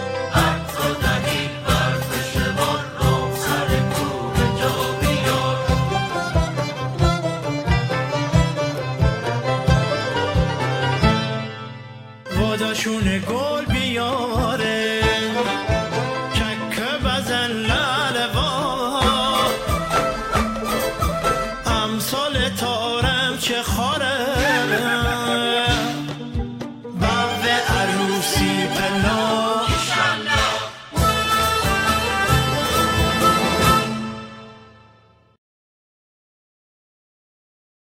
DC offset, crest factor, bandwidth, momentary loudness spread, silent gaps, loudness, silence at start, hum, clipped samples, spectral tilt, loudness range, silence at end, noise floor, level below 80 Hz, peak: under 0.1%; 18 dB; 16 kHz; 6 LU; none; -20 LUFS; 0 s; none; under 0.1%; -4.5 dB/octave; 3 LU; 3.25 s; -53 dBFS; -32 dBFS; -4 dBFS